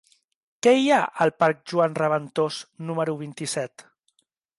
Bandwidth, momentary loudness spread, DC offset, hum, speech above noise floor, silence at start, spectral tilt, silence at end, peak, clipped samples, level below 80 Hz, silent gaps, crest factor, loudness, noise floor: 11.5 kHz; 12 LU; under 0.1%; none; 47 dB; 0.65 s; -5 dB/octave; 0.8 s; -6 dBFS; under 0.1%; -72 dBFS; none; 18 dB; -23 LUFS; -70 dBFS